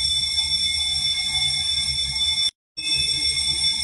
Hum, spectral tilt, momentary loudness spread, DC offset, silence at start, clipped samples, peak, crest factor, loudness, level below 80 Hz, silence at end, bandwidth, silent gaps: none; 0.5 dB/octave; 2 LU; under 0.1%; 0 s; under 0.1%; -10 dBFS; 14 dB; -20 LUFS; -42 dBFS; 0 s; 12.5 kHz; 2.55-2.75 s